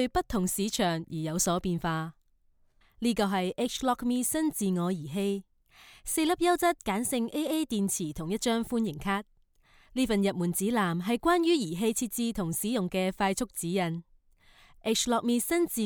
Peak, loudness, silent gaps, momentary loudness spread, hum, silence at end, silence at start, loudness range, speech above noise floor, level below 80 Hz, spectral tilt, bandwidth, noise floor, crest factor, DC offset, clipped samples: -14 dBFS; -29 LUFS; none; 6 LU; none; 0 s; 0 s; 3 LU; 37 dB; -54 dBFS; -4.5 dB/octave; over 20 kHz; -66 dBFS; 16 dB; under 0.1%; under 0.1%